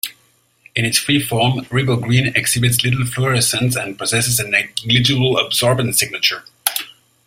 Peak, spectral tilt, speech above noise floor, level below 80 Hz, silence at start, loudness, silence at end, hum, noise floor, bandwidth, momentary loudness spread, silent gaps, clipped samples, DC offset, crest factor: 0 dBFS; -3.5 dB/octave; 41 dB; -48 dBFS; 0.05 s; -16 LUFS; 0.35 s; none; -57 dBFS; 16.5 kHz; 6 LU; none; under 0.1%; under 0.1%; 18 dB